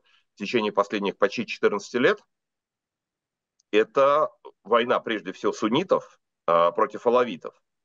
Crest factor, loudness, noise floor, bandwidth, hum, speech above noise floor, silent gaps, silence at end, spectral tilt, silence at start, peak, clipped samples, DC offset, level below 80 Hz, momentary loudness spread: 18 dB; -24 LUFS; -88 dBFS; 7.6 kHz; none; 65 dB; none; 0.35 s; -5 dB/octave; 0.4 s; -6 dBFS; under 0.1%; under 0.1%; -74 dBFS; 9 LU